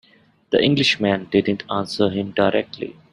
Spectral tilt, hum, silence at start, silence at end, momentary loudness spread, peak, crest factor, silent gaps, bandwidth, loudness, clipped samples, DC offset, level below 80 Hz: -5.5 dB/octave; none; 0.5 s; 0.2 s; 8 LU; -2 dBFS; 18 dB; none; 11.5 kHz; -20 LUFS; under 0.1%; under 0.1%; -56 dBFS